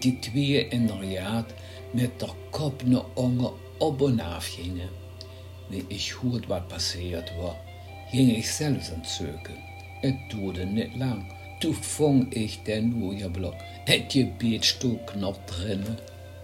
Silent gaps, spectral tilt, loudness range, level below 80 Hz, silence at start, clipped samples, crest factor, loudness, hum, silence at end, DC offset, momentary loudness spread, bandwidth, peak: none; -5 dB/octave; 5 LU; -56 dBFS; 0 s; under 0.1%; 24 dB; -28 LUFS; none; 0 s; under 0.1%; 16 LU; 16 kHz; -4 dBFS